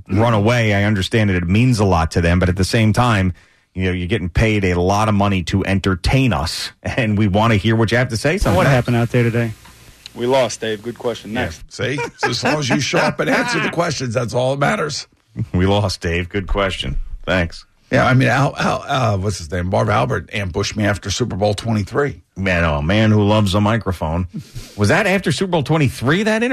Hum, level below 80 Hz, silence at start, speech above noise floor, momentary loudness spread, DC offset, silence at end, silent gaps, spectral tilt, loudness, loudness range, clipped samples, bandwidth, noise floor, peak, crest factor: none; -34 dBFS; 0.1 s; 24 dB; 9 LU; under 0.1%; 0 s; none; -5.5 dB/octave; -17 LUFS; 3 LU; under 0.1%; 13.5 kHz; -41 dBFS; -6 dBFS; 12 dB